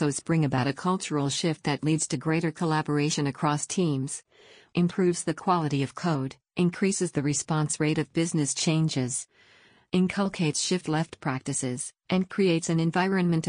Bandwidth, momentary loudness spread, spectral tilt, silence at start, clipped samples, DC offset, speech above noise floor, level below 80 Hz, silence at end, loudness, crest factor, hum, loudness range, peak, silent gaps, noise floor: 10 kHz; 6 LU; -5 dB/octave; 0 s; under 0.1%; under 0.1%; 32 dB; -62 dBFS; 0 s; -27 LUFS; 14 dB; none; 1 LU; -12 dBFS; none; -58 dBFS